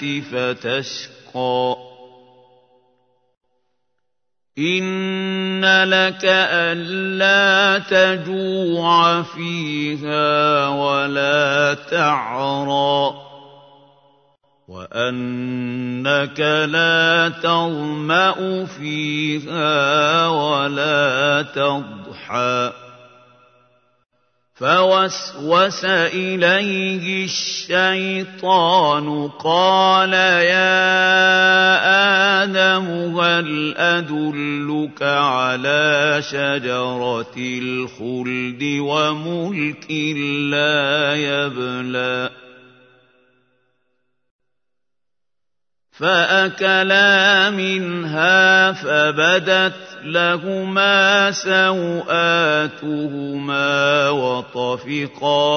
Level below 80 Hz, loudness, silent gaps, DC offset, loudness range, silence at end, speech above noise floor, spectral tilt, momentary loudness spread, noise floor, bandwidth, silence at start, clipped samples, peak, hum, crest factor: -70 dBFS; -17 LUFS; 3.37-3.41 s, 44.31-44.39 s; under 0.1%; 11 LU; 0 s; 68 dB; -4 dB/octave; 11 LU; -86 dBFS; 6.6 kHz; 0 s; under 0.1%; -2 dBFS; none; 18 dB